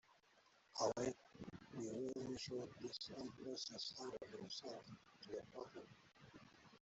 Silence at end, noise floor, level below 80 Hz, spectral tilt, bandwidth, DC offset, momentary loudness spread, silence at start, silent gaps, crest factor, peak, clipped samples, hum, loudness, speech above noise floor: 0 s; -74 dBFS; -80 dBFS; -4 dB/octave; 8.2 kHz; under 0.1%; 20 LU; 0.1 s; none; 22 dB; -28 dBFS; under 0.1%; none; -49 LUFS; 25 dB